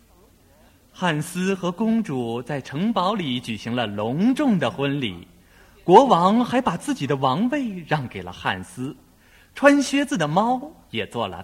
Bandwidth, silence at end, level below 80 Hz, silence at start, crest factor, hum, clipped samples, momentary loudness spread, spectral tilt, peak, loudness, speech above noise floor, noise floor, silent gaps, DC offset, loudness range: 16 kHz; 0 s; -56 dBFS; 1 s; 22 dB; none; under 0.1%; 13 LU; -5.5 dB/octave; 0 dBFS; -22 LUFS; 33 dB; -54 dBFS; none; under 0.1%; 5 LU